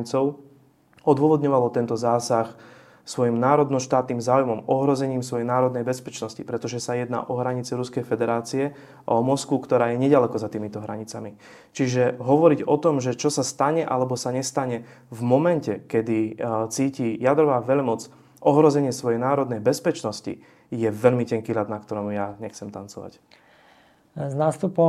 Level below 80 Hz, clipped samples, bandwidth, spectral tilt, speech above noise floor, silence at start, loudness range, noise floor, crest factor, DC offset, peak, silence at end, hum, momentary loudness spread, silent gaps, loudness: -68 dBFS; under 0.1%; 14 kHz; -6 dB/octave; 34 dB; 0 s; 5 LU; -56 dBFS; 22 dB; under 0.1%; -2 dBFS; 0 s; none; 14 LU; none; -23 LUFS